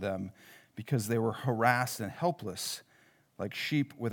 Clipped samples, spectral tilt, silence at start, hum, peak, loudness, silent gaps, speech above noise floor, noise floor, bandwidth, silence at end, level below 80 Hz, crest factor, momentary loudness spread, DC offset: under 0.1%; -5 dB/octave; 0 s; none; -10 dBFS; -33 LUFS; none; 33 dB; -65 dBFS; over 20 kHz; 0 s; -78 dBFS; 24 dB; 14 LU; under 0.1%